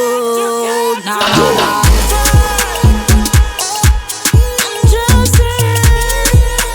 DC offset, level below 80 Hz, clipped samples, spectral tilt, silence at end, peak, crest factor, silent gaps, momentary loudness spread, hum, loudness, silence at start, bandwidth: under 0.1%; -14 dBFS; under 0.1%; -4 dB/octave; 0 s; 0 dBFS; 10 dB; none; 5 LU; none; -11 LUFS; 0 s; over 20 kHz